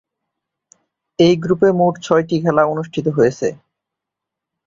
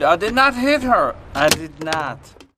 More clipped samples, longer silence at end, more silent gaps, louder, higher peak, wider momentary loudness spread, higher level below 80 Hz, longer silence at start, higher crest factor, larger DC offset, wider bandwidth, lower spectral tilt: neither; first, 1.15 s vs 0.4 s; neither; about the same, -16 LUFS vs -17 LUFS; about the same, -2 dBFS vs 0 dBFS; about the same, 8 LU vs 9 LU; second, -54 dBFS vs -42 dBFS; first, 1.2 s vs 0 s; about the same, 16 dB vs 18 dB; neither; second, 7.6 kHz vs 15.5 kHz; first, -6.5 dB/octave vs -3 dB/octave